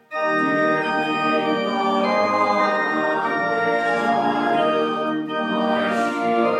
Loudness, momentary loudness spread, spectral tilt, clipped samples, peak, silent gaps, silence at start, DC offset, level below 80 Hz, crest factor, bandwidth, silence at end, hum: -20 LUFS; 3 LU; -5.5 dB/octave; under 0.1%; -6 dBFS; none; 0.1 s; under 0.1%; -70 dBFS; 14 dB; 12.5 kHz; 0 s; none